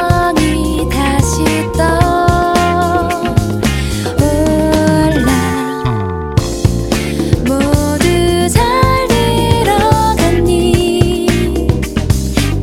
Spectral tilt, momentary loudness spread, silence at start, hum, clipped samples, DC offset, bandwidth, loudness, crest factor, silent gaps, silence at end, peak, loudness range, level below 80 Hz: -5.5 dB/octave; 5 LU; 0 s; none; 0.2%; under 0.1%; 17 kHz; -13 LUFS; 12 dB; none; 0 s; 0 dBFS; 2 LU; -22 dBFS